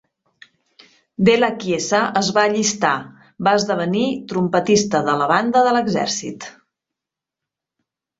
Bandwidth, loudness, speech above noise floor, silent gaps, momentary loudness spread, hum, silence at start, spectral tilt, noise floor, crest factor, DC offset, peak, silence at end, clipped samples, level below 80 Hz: 8 kHz; -18 LUFS; 68 dB; none; 9 LU; none; 1.2 s; -4 dB/octave; -86 dBFS; 18 dB; under 0.1%; -2 dBFS; 1.7 s; under 0.1%; -58 dBFS